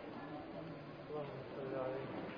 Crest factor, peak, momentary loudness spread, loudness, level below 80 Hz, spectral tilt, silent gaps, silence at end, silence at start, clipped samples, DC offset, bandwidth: 16 dB; -30 dBFS; 7 LU; -46 LUFS; -72 dBFS; -5.5 dB/octave; none; 0 s; 0 s; under 0.1%; under 0.1%; 5.2 kHz